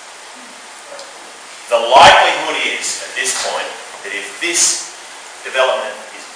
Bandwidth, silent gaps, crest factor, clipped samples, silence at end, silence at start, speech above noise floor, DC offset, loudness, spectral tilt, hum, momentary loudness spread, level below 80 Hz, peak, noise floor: 10.5 kHz; none; 16 dB; under 0.1%; 0 s; 0 s; 21 dB; under 0.1%; -13 LUFS; 0 dB/octave; none; 26 LU; -52 dBFS; 0 dBFS; -35 dBFS